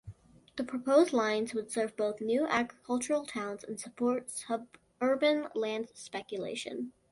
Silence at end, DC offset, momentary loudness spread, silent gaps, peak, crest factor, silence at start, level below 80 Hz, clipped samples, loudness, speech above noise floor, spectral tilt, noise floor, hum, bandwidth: 0.2 s; under 0.1%; 13 LU; none; -14 dBFS; 20 dB; 0.05 s; -70 dBFS; under 0.1%; -32 LUFS; 20 dB; -3.5 dB/octave; -52 dBFS; none; 11.5 kHz